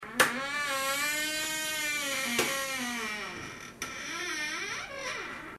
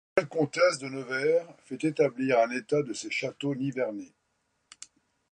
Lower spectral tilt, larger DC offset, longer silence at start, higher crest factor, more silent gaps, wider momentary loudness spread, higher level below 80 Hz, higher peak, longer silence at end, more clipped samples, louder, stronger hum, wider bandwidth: second, -1 dB/octave vs -5 dB/octave; neither; second, 0 s vs 0.15 s; first, 26 dB vs 20 dB; neither; second, 10 LU vs 16 LU; first, -64 dBFS vs -74 dBFS; about the same, -6 dBFS vs -8 dBFS; second, 0 s vs 1.25 s; neither; second, -31 LUFS vs -28 LUFS; neither; first, 16 kHz vs 10.5 kHz